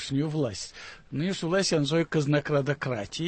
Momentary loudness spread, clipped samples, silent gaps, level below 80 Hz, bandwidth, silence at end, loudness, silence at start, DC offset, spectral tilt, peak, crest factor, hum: 12 LU; under 0.1%; none; -58 dBFS; 8.8 kHz; 0 s; -27 LUFS; 0 s; under 0.1%; -5.5 dB/octave; -14 dBFS; 14 dB; none